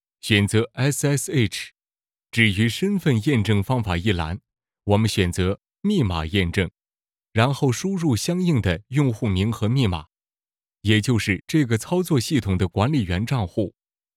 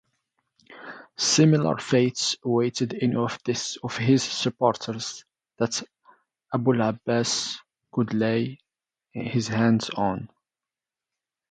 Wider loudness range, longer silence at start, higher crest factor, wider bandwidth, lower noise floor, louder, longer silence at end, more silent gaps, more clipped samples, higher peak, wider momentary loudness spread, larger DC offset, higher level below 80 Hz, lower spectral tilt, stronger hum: second, 1 LU vs 4 LU; second, 0.25 s vs 0.7 s; about the same, 18 dB vs 20 dB; first, 15.5 kHz vs 9.4 kHz; about the same, under -90 dBFS vs under -90 dBFS; first, -22 LUFS vs -25 LUFS; second, 0.5 s vs 1.25 s; neither; neither; about the same, -4 dBFS vs -6 dBFS; second, 8 LU vs 13 LU; neither; first, -48 dBFS vs -64 dBFS; about the same, -5.5 dB/octave vs -4.5 dB/octave; neither